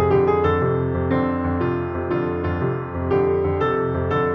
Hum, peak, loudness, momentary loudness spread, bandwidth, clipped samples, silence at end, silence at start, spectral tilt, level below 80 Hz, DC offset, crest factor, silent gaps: none; -6 dBFS; -21 LUFS; 6 LU; 5.8 kHz; under 0.1%; 0 s; 0 s; -10 dB/octave; -40 dBFS; under 0.1%; 14 dB; none